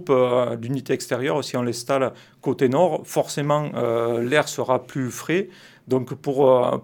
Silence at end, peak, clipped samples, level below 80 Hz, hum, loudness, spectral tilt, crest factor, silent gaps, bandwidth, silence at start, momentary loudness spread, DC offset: 0.05 s; -4 dBFS; under 0.1%; -68 dBFS; none; -22 LUFS; -5.5 dB/octave; 18 dB; none; 19 kHz; 0 s; 8 LU; under 0.1%